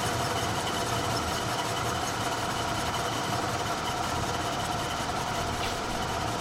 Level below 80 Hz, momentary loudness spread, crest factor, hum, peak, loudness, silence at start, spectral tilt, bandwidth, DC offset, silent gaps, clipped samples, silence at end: -48 dBFS; 2 LU; 14 dB; none; -16 dBFS; -29 LUFS; 0 s; -3.5 dB/octave; 16.5 kHz; under 0.1%; none; under 0.1%; 0 s